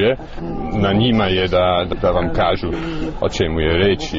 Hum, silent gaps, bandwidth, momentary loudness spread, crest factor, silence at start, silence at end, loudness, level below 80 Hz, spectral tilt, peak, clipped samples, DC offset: none; none; 7.8 kHz; 9 LU; 12 dB; 0 s; 0 s; -18 LUFS; -30 dBFS; -4.5 dB/octave; -4 dBFS; under 0.1%; under 0.1%